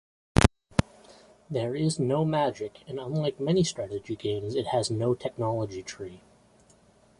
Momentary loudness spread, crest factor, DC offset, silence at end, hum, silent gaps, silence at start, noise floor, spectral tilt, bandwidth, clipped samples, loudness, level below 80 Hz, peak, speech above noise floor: 14 LU; 28 dB; under 0.1%; 1.05 s; none; none; 0.35 s; -60 dBFS; -6 dB/octave; 11.5 kHz; under 0.1%; -28 LUFS; -42 dBFS; 0 dBFS; 31 dB